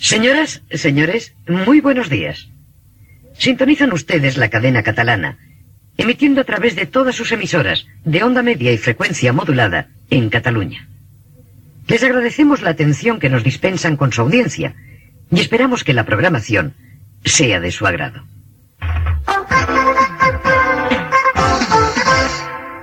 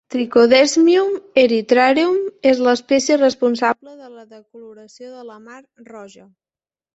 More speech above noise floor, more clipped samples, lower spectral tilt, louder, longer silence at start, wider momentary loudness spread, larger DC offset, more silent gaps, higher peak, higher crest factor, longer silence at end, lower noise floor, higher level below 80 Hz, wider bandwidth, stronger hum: second, 31 dB vs over 73 dB; neither; first, -4.5 dB/octave vs -3 dB/octave; about the same, -15 LUFS vs -15 LUFS; about the same, 0 s vs 0.1 s; second, 9 LU vs 15 LU; neither; neither; about the same, 0 dBFS vs -2 dBFS; about the same, 16 dB vs 16 dB; second, 0 s vs 0.85 s; second, -46 dBFS vs under -90 dBFS; first, -36 dBFS vs -62 dBFS; first, 16 kHz vs 8.2 kHz; neither